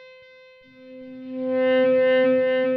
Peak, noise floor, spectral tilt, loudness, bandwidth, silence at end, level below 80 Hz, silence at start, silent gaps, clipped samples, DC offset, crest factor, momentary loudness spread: -12 dBFS; -50 dBFS; -7.5 dB/octave; -20 LUFS; 4.9 kHz; 0 s; -72 dBFS; 0.85 s; none; under 0.1%; under 0.1%; 10 dB; 21 LU